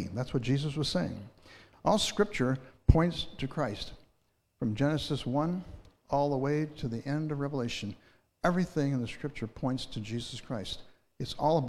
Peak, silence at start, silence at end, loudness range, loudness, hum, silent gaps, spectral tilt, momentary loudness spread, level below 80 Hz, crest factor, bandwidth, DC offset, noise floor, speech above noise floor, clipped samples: -4 dBFS; 0 s; 0 s; 4 LU; -32 LUFS; none; none; -6 dB/octave; 12 LU; -44 dBFS; 26 dB; 13.5 kHz; under 0.1%; -74 dBFS; 43 dB; under 0.1%